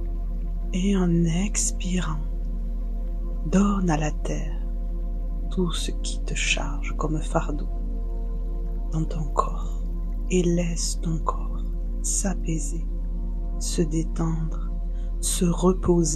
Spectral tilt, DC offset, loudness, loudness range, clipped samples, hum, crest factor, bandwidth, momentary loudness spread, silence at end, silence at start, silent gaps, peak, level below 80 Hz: -5 dB/octave; under 0.1%; -27 LUFS; 3 LU; under 0.1%; none; 20 dB; 12.5 kHz; 10 LU; 0 s; 0 s; none; -4 dBFS; -26 dBFS